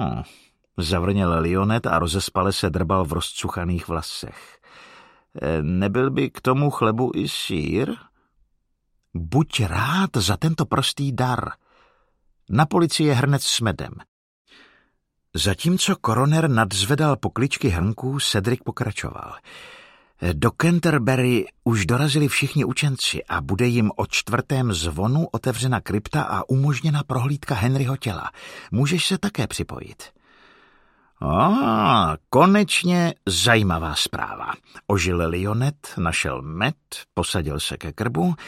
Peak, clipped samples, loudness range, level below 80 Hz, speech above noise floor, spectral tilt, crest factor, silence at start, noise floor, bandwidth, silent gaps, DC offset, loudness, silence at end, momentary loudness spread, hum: 0 dBFS; under 0.1%; 5 LU; -42 dBFS; 49 dB; -5 dB/octave; 22 dB; 0 s; -70 dBFS; 16 kHz; 14.08-14.45 s; under 0.1%; -21 LUFS; 0 s; 11 LU; none